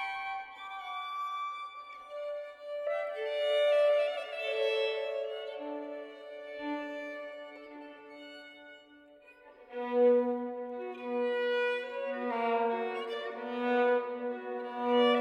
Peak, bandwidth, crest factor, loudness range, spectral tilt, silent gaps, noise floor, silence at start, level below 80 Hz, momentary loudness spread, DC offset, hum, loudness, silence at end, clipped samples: -16 dBFS; 9.8 kHz; 18 dB; 11 LU; -4 dB/octave; none; -57 dBFS; 0 s; -82 dBFS; 19 LU; under 0.1%; none; -33 LUFS; 0 s; under 0.1%